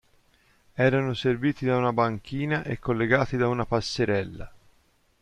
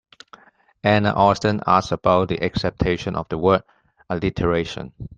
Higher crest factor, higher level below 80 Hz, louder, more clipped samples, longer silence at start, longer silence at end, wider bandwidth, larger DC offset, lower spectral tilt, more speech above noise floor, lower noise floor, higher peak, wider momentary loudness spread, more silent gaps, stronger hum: about the same, 20 dB vs 18 dB; second, -52 dBFS vs -42 dBFS; second, -25 LUFS vs -20 LUFS; neither; about the same, 0.75 s vs 0.85 s; first, 0.65 s vs 0.05 s; first, 10.5 kHz vs 9 kHz; neither; about the same, -6.5 dB/octave vs -6.5 dB/octave; first, 39 dB vs 30 dB; first, -64 dBFS vs -50 dBFS; second, -6 dBFS vs -2 dBFS; about the same, 6 LU vs 8 LU; neither; neither